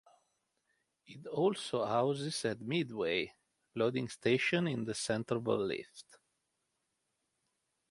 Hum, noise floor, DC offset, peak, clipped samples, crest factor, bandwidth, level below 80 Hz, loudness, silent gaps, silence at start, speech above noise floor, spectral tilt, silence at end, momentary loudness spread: none; -83 dBFS; under 0.1%; -16 dBFS; under 0.1%; 20 dB; 11.5 kHz; -74 dBFS; -35 LUFS; none; 1.1 s; 49 dB; -5 dB/octave; 1.9 s; 11 LU